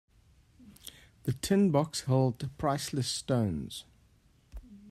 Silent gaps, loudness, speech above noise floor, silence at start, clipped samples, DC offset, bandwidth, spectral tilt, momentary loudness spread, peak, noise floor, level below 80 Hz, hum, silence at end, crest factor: none; -30 LUFS; 35 dB; 0.65 s; under 0.1%; under 0.1%; 15 kHz; -6 dB/octave; 22 LU; -14 dBFS; -64 dBFS; -56 dBFS; none; 0 s; 18 dB